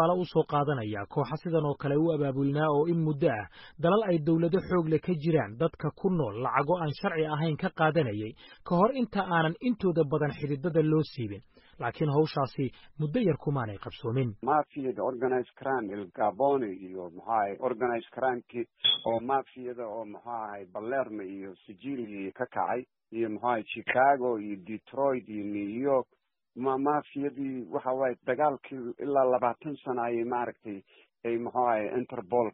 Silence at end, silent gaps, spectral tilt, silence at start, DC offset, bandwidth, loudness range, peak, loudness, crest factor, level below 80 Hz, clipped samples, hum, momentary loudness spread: 0.05 s; none; -5 dB/octave; 0 s; under 0.1%; 5.6 kHz; 4 LU; -10 dBFS; -30 LUFS; 20 dB; -64 dBFS; under 0.1%; none; 12 LU